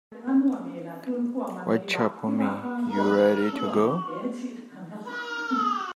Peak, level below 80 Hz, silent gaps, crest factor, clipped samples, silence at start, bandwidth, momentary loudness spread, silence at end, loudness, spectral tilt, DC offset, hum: -8 dBFS; -78 dBFS; none; 18 dB; under 0.1%; 0.1 s; 13 kHz; 14 LU; 0.05 s; -26 LUFS; -6.5 dB/octave; under 0.1%; none